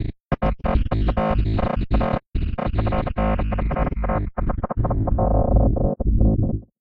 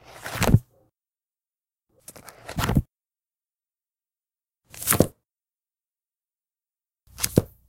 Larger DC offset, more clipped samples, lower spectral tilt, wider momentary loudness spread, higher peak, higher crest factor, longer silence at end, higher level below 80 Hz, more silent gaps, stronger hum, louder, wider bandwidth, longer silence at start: neither; neither; first, -11 dB/octave vs -5 dB/octave; second, 6 LU vs 23 LU; second, -4 dBFS vs 0 dBFS; second, 16 dB vs 30 dB; about the same, 0.2 s vs 0.2 s; first, -24 dBFS vs -40 dBFS; first, 2.28-2.32 s vs none; neither; about the same, -23 LUFS vs -24 LUFS; second, 4.6 kHz vs 17 kHz; second, 0 s vs 0.15 s